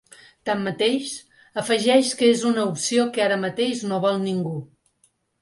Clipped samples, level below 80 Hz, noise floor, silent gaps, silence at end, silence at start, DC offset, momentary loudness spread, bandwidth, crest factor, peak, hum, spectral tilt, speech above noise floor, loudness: under 0.1%; -68 dBFS; -65 dBFS; none; 0.75 s; 0.45 s; under 0.1%; 13 LU; 11.5 kHz; 18 dB; -4 dBFS; none; -4 dB/octave; 44 dB; -22 LUFS